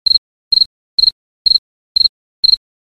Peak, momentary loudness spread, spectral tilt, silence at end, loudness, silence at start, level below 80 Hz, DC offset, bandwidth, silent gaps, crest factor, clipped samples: 0 dBFS; 3 LU; 0 dB/octave; 0.35 s; -12 LUFS; 0.05 s; -48 dBFS; under 0.1%; 13 kHz; 0.18-0.51 s, 0.66-0.98 s, 1.12-1.45 s, 1.58-1.95 s, 2.09-2.43 s; 16 dB; under 0.1%